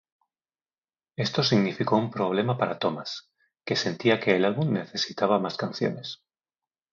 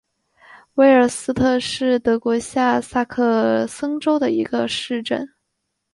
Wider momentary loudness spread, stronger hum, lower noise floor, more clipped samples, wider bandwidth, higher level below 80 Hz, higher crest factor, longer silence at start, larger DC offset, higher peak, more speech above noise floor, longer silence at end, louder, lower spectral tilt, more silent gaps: first, 14 LU vs 9 LU; neither; first, under -90 dBFS vs -76 dBFS; neither; second, 7.4 kHz vs 11.5 kHz; second, -70 dBFS vs -52 dBFS; about the same, 20 dB vs 16 dB; first, 1.2 s vs 0.55 s; neither; second, -6 dBFS vs -2 dBFS; first, over 64 dB vs 57 dB; first, 0.8 s vs 0.65 s; second, -26 LUFS vs -19 LUFS; about the same, -5.5 dB/octave vs -4.5 dB/octave; neither